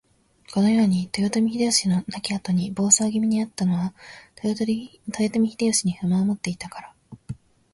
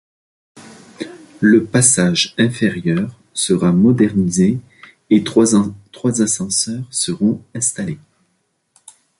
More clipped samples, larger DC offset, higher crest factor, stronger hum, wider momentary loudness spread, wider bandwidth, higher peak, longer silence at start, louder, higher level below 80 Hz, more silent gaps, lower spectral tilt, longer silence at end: neither; neither; about the same, 20 dB vs 18 dB; neither; about the same, 16 LU vs 14 LU; about the same, 11.5 kHz vs 11.5 kHz; second, -4 dBFS vs 0 dBFS; about the same, 0.5 s vs 0.55 s; second, -22 LUFS vs -16 LUFS; second, -58 dBFS vs -50 dBFS; neither; about the same, -4.5 dB/octave vs -4.5 dB/octave; second, 0.4 s vs 1.25 s